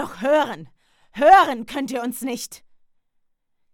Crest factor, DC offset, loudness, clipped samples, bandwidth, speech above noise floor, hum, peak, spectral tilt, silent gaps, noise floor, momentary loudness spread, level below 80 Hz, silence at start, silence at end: 20 dB; under 0.1%; -19 LUFS; under 0.1%; 17.5 kHz; 48 dB; none; -2 dBFS; -3.5 dB/octave; none; -67 dBFS; 21 LU; -58 dBFS; 0 s; 1.2 s